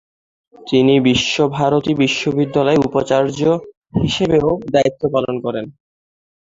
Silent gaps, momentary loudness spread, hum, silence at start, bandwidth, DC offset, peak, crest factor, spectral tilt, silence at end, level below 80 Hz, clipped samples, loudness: 3.77-3.81 s; 9 LU; none; 0.6 s; 7.8 kHz; under 0.1%; -2 dBFS; 16 dB; -5.5 dB/octave; 0.75 s; -46 dBFS; under 0.1%; -16 LUFS